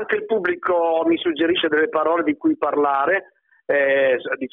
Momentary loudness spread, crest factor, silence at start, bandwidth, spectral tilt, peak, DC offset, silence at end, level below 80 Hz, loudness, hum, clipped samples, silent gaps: 4 LU; 12 dB; 0 s; 3.9 kHz; -7.5 dB/octave; -8 dBFS; under 0.1%; 0.05 s; -64 dBFS; -20 LUFS; none; under 0.1%; none